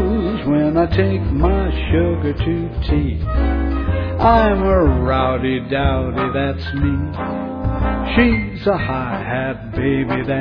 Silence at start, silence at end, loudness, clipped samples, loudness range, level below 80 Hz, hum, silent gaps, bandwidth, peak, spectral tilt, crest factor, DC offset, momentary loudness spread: 0 s; 0 s; -18 LUFS; under 0.1%; 3 LU; -24 dBFS; none; none; 5.4 kHz; 0 dBFS; -10 dB/octave; 16 dB; under 0.1%; 7 LU